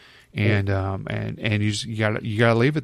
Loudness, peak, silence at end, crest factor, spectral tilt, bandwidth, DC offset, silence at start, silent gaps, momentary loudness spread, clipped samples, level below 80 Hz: -23 LUFS; -6 dBFS; 0 s; 16 dB; -6 dB/octave; 11 kHz; under 0.1%; 0.35 s; none; 9 LU; under 0.1%; -52 dBFS